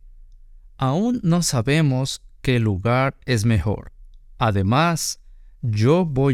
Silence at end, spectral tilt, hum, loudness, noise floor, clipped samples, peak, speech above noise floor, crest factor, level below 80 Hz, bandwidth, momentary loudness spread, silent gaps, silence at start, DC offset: 0 s; -5.5 dB/octave; none; -21 LUFS; -45 dBFS; under 0.1%; -4 dBFS; 25 dB; 16 dB; -40 dBFS; 16 kHz; 9 LU; none; 0.3 s; under 0.1%